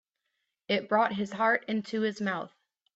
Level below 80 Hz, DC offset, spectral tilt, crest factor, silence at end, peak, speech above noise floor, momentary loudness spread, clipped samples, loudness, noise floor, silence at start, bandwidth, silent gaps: -76 dBFS; under 0.1%; -5.5 dB/octave; 18 dB; 0.5 s; -12 dBFS; 53 dB; 7 LU; under 0.1%; -29 LUFS; -82 dBFS; 0.7 s; 8 kHz; none